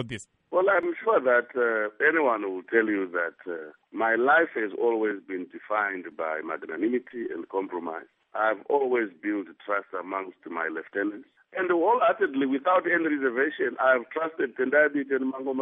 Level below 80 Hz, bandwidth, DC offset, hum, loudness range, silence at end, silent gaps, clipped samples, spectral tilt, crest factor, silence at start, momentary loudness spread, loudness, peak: -76 dBFS; 8 kHz; under 0.1%; none; 5 LU; 0 s; none; under 0.1%; -3 dB/octave; 18 dB; 0 s; 13 LU; -26 LUFS; -8 dBFS